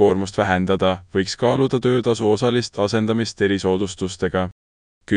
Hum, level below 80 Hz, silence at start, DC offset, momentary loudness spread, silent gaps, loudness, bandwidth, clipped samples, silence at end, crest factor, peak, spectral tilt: none; -50 dBFS; 0 s; under 0.1%; 5 LU; 4.52-5.01 s; -20 LUFS; 10.5 kHz; under 0.1%; 0 s; 16 dB; -2 dBFS; -6 dB/octave